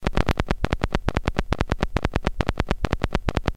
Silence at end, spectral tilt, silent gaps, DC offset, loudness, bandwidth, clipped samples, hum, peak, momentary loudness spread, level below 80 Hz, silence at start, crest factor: 0 s; -6 dB/octave; none; 2%; -26 LUFS; 15.5 kHz; under 0.1%; none; 0 dBFS; 2 LU; -28 dBFS; 0 s; 24 dB